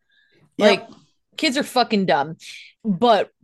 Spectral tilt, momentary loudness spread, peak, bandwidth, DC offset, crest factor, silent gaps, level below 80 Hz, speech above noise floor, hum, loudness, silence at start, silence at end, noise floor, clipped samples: -4.5 dB/octave; 19 LU; -2 dBFS; 12.5 kHz; under 0.1%; 20 dB; none; -68 dBFS; 40 dB; none; -20 LUFS; 0.6 s; 0.15 s; -59 dBFS; under 0.1%